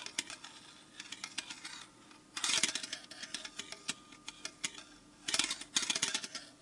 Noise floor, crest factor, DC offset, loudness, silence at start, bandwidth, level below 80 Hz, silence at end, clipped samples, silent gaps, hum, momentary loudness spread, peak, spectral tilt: -59 dBFS; 30 dB; under 0.1%; -37 LUFS; 0 s; 11.5 kHz; -76 dBFS; 0 s; under 0.1%; none; none; 19 LU; -10 dBFS; 1 dB/octave